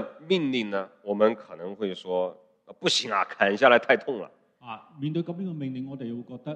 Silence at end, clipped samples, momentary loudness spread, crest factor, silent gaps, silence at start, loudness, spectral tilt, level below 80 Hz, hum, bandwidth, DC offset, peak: 0 s; under 0.1%; 16 LU; 22 dB; none; 0 s; -26 LUFS; -4.5 dB/octave; -76 dBFS; none; 10.5 kHz; under 0.1%; -4 dBFS